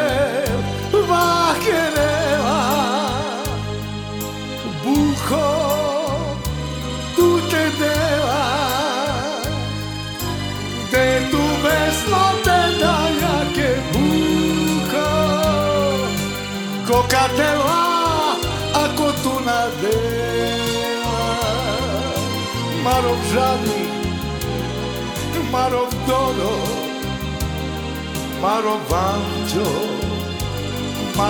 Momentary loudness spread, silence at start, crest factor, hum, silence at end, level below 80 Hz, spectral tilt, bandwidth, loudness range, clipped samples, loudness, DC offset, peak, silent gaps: 8 LU; 0 s; 16 dB; none; 0 s; -36 dBFS; -4.5 dB/octave; over 20 kHz; 4 LU; under 0.1%; -19 LUFS; under 0.1%; -2 dBFS; none